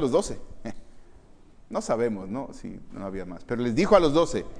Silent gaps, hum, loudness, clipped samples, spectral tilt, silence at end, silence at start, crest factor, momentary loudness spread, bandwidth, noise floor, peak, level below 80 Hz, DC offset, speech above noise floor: none; none; -25 LUFS; under 0.1%; -5.5 dB/octave; 0 s; 0 s; 22 dB; 21 LU; 10.5 kHz; -50 dBFS; -4 dBFS; -44 dBFS; under 0.1%; 25 dB